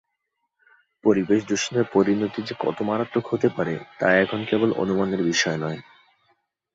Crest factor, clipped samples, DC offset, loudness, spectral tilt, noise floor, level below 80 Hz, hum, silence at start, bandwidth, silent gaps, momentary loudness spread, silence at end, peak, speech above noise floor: 20 dB; under 0.1%; under 0.1%; -23 LUFS; -5 dB/octave; -77 dBFS; -60 dBFS; none; 1.05 s; 8 kHz; none; 8 LU; 0.95 s; -4 dBFS; 55 dB